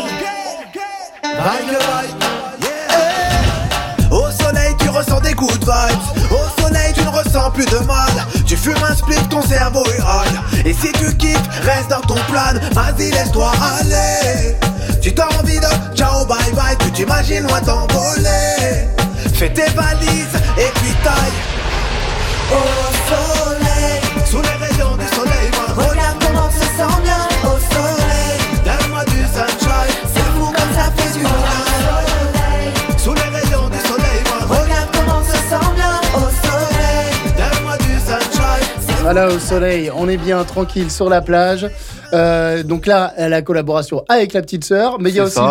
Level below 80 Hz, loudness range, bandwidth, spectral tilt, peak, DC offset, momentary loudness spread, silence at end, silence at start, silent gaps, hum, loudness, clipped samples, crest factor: -20 dBFS; 1 LU; 17 kHz; -4.5 dB/octave; -2 dBFS; under 0.1%; 4 LU; 0 s; 0 s; none; none; -15 LUFS; under 0.1%; 10 dB